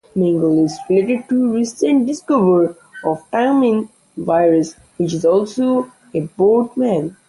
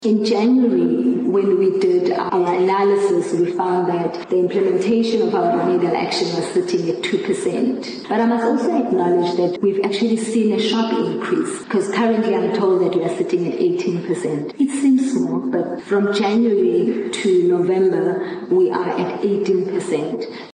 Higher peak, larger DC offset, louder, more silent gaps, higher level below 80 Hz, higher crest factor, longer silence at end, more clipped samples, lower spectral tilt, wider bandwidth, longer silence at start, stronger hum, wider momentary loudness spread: first, -2 dBFS vs -8 dBFS; neither; about the same, -17 LUFS vs -18 LUFS; neither; first, -58 dBFS vs -68 dBFS; about the same, 14 dB vs 10 dB; about the same, 0.15 s vs 0.05 s; neither; about the same, -7 dB/octave vs -6 dB/octave; first, 11.5 kHz vs 10 kHz; first, 0.15 s vs 0 s; neither; first, 9 LU vs 6 LU